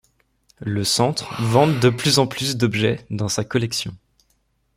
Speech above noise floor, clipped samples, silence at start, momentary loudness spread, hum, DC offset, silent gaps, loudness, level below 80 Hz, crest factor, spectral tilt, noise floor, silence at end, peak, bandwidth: 46 dB; under 0.1%; 0.6 s; 9 LU; none; under 0.1%; none; -20 LUFS; -54 dBFS; 20 dB; -4.5 dB/octave; -66 dBFS; 0.8 s; -2 dBFS; 16 kHz